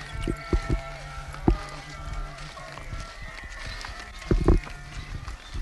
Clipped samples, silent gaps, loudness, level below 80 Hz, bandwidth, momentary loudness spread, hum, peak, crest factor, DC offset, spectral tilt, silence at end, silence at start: under 0.1%; none; -32 LUFS; -32 dBFS; 12 kHz; 14 LU; none; -4 dBFS; 24 dB; under 0.1%; -6 dB/octave; 0 s; 0 s